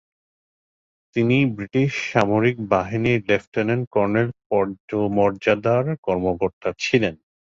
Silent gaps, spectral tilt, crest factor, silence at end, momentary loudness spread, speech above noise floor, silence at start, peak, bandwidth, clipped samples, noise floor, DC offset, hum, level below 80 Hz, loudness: 3.47-3.52 s, 3.87-3.91 s, 4.46-4.50 s, 4.80-4.88 s, 5.98-6.03 s, 6.53-6.61 s; -7 dB/octave; 20 dB; 0.45 s; 5 LU; over 69 dB; 1.15 s; -2 dBFS; 7.6 kHz; under 0.1%; under -90 dBFS; under 0.1%; none; -52 dBFS; -21 LUFS